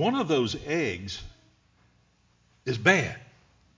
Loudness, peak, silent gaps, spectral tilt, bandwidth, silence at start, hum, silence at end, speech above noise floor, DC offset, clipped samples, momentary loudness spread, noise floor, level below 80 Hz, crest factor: -26 LUFS; -4 dBFS; none; -5 dB/octave; 7.6 kHz; 0 s; none; 0.55 s; 39 dB; under 0.1%; under 0.1%; 16 LU; -65 dBFS; -54 dBFS; 24 dB